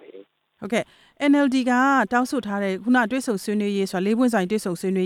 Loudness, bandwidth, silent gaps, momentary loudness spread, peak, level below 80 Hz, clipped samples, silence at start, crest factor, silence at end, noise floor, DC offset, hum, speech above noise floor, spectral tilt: -22 LUFS; 15 kHz; none; 8 LU; -8 dBFS; -64 dBFS; under 0.1%; 0.1 s; 14 dB; 0 s; -48 dBFS; under 0.1%; none; 27 dB; -5.5 dB/octave